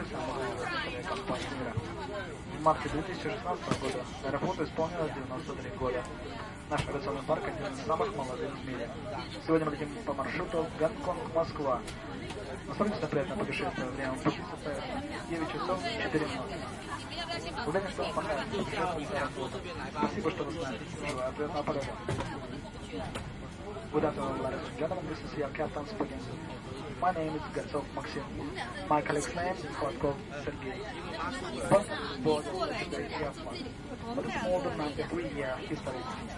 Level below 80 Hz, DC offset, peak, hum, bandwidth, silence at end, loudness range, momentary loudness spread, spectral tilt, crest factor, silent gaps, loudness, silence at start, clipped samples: -52 dBFS; under 0.1%; -10 dBFS; none; 11.5 kHz; 0 s; 3 LU; 9 LU; -5.5 dB/octave; 24 dB; none; -35 LUFS; 0 s; under 0.1%